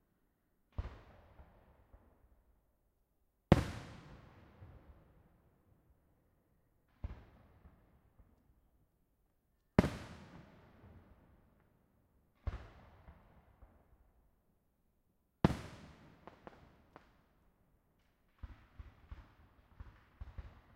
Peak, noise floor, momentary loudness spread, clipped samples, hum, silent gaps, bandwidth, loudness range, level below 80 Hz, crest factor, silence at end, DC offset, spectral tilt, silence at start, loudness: -8 dBFS; -78 dBFS; 28 LU; under 0.1%; none; none; 15.5 kHz; 20 LU; -56 dBFS; 38 dB; 0.25 s; under 0.1%; -7.5 dB/octave; 0.8 s; -38 LUFS